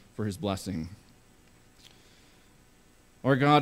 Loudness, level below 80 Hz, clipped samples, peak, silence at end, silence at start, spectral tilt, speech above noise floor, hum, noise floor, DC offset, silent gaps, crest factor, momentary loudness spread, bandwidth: -30 LUFS; -60 dBFS; under 0.1%; -10 dBFS; 0 s; 0.2 s; -6.5 dB/octave; 33 dB; 60 Hz at -65 dBFS; -59 dBFS; under 0.1%; none; 22 dB; 17 LU; 15.5 kHz